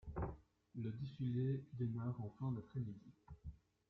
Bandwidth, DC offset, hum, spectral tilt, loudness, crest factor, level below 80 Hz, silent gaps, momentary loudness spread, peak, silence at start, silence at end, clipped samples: 4.8 kHz; under 0.1%; none; -10.5 dB/octave; -45 LUFS; 14 dB; -62 dBFS; none; 17 LU; -32 dBFS; 0.05 s; 0.35 s; under 0.1%